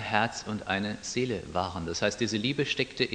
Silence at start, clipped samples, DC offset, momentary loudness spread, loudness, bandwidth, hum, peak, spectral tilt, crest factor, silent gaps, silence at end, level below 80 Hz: 0 s; under 0.1%; under 0.1%; 4 LU; -30 LUFS; 10 kHz; none; -8 dBFS; -4 dB/octave; 22 dB; none; 0 s; -56 dBFS